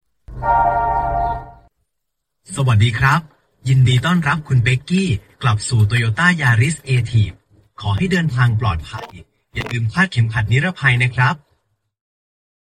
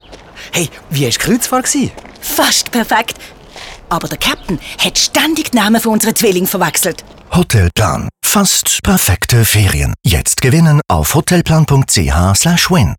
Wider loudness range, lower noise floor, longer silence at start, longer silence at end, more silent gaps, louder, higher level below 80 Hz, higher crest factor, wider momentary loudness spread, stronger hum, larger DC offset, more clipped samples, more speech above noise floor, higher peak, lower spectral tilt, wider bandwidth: about the same, 3 LU vs 4 LU; first, -77 dBFS vs -34 dBFS; first, 0.3 s vs 0.1 s; first, 1.4 s vs 0.05 s; neither; second, -17 LUFS vs -12 LUFS; second, -38 dBFS vs -28 dBFS; first, 18 dB vs 12 dB; first, 12 LU vs 9 LU; neither; neither; neither; first, 61 dB vs 22 dB; about the same, 0 dBFS vs -2 dBFS; first, -6 dB/octave vs -4 dB/octave; second, 10 kHz vs 19.5 kHz